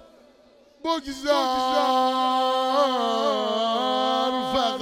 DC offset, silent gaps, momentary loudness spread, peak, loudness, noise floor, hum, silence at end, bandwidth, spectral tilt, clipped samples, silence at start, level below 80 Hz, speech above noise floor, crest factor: under 0.1%; none; 6 LU; -8 dBFS; -23 LUFS; -55 dBFS; none; 0 s; 17 kHz; -3 dB/octave; under 0.1%; 0.85 s; -58 dBFS; 32 dB; 14 dB